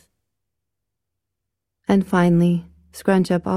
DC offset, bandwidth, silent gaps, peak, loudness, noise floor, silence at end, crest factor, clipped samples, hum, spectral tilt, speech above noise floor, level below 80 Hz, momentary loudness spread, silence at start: under 0.1%; 13 kHz; none; -4 dBFS; -19 LUFS; -82 dBFS; 0 s; 18 dB; under 0.1%; none; -7.5 dB/octave; 65 dB; -54 dBFS; 10 LU; 1.9 s